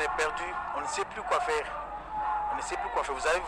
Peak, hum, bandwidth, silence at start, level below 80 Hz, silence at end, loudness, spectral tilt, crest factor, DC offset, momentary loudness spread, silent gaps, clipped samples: -14 dBFS; none; 13.5 kHz; 0 s; -52 dBFS; 0 s; -31 LUFS; -2 dB/octave; 18 dB; under 0.1%; 6 LU; none; under 0.1%